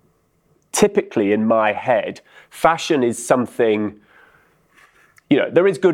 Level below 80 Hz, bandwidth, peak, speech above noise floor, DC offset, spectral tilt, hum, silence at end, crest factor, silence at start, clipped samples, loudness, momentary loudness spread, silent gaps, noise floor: -56 dBFS; 16 kHz; 0 dBFS; 44 dB; under 0.1%; -4.5 dB/octave; none; 0 s; 18 dB; 0.75 s; under 0.1%; -18 LUFS; 6 LU; none; -61 dBFS